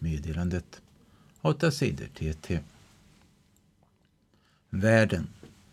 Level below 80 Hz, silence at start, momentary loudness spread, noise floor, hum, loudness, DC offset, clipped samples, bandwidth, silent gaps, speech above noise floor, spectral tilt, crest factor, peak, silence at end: -46 dBFS; 0 s; 13 LU; -67 dBFS; none; -29 LUFS; under 0.1%; under 0.1%; 14 kHz; none; 39 dB; -6.5 dB/octave; 24 dB; -6 dBFS; 0.25 s